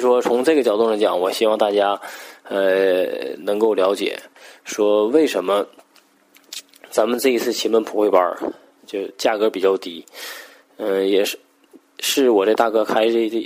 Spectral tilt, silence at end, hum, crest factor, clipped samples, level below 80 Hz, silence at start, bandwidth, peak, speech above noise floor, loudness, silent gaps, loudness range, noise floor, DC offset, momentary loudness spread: -3 dB/octave; 0 s; none; 18 dB; under 0.1%; -74 dBFS; 0 s; 16 kHz; -2 dBFS; 37 dB; -19 LUFS; none; 3 LU; -55 dBFS; under 0.1%; 16 LU